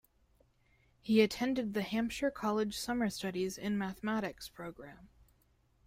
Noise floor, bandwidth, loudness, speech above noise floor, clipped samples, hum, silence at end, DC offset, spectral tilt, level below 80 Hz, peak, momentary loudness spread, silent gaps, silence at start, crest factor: -71 dBFS; 16 kHz; -34 LUFS; 37 dB; under 0.1%; none; 0.8 s; under 0.1%; -5 dB/octave; -64 dBFS; -14 dBFS; 17 LU; none; 1.05 s; 22 dB